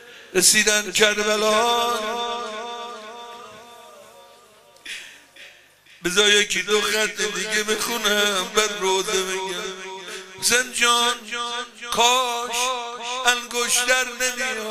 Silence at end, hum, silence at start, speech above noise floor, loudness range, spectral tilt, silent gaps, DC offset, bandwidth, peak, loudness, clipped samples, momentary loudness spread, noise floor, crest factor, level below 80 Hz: 0 s; none; 0 s; 30 dB; 12 LU; -0.5 dB/octave; none; under 0.1%; 15.5 kHz; 0 dBFS; -20 LUFS; under 0.1%; 17 LU; -51 dBFS; 22 dB; -56 dBFS